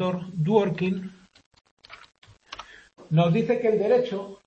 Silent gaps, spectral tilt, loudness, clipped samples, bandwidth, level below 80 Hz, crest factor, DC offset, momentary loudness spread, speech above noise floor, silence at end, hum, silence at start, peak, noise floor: 1.46-1.51 s, 1.71-1.77 s, 2.18-2.22 s; -8.5 dB/octave; -24 LUFS; under 0.1%; 7.6 kHz; -64 dBFS; 20 dB; under 0.1%; 20 LU; 21 dB; 0.1 s; none; 0 s; -6 dBFS; -44 dBFS